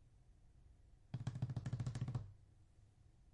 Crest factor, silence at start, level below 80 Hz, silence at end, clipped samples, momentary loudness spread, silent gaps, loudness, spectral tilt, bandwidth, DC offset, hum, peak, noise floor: 18 dB; 0 s; -64 dBFS; 0 s; under 0.1%; 12 LU; none; -47 LUFS; -7.5 dB/octave; 10.5 kHz; under 0.1%; none; -32 dBFS; -67 dBFS